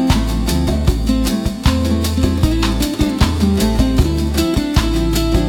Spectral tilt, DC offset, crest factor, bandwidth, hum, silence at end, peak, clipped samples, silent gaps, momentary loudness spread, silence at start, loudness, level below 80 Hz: -5.5 dB/octave; under 0.1%; 14 dB; 17.5 kHz; none; 0 s; -2 dBFS; under 0.1%; none; 2 LU; 0 s; -16 LUFS; -20 dBFS